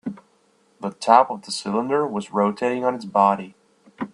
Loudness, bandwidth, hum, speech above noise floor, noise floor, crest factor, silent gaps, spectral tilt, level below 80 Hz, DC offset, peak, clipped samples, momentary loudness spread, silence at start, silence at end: -21 LUFS; 11.5 kHz; none; 41 dB; -61 dBFS; 22 dB; none; -5 dB/octave; -70 dBFS; under 0.1%; 0 dBFS; under 0.1%; 17 LU; 0.05 s; 0.05 s